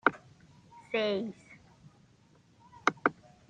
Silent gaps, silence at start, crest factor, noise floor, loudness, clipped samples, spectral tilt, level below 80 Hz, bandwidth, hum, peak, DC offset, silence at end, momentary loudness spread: none; 0.05 s; 28 dB; -63 dBFS; -33 LUFS; under 0.1%; -4.5 dB/octave; -74 dBFS; 9.6 kHz; none; -6 dBFS; under 0.1%; 0.35 s; 23 LU